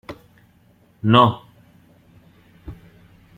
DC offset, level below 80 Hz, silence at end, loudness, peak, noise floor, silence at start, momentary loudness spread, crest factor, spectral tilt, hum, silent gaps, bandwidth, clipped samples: under 0.1%; -52 dBFS; 0.65 s; -17 LUFS; -2 dBFS; -56 dBFS; 0.1 s; 27 LU; 22 dB; -8 dB/octave; none; none; 14.5 kHz; under 0.1%